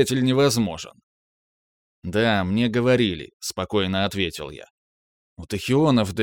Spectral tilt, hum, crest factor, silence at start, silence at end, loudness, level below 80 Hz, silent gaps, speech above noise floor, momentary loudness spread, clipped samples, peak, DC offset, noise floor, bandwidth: -5 dB/octave; none; 16 dB; 0 s; 0 s; -22 LUFS; -52 dBFS; 1.03-2.02 s, 3.33-3.40 s, 4.70-5.36 s; over 68 dB; 15 LU; under 0.1%; -6 dBFS; under 0.1%; under -90 dBFS; 18 kHz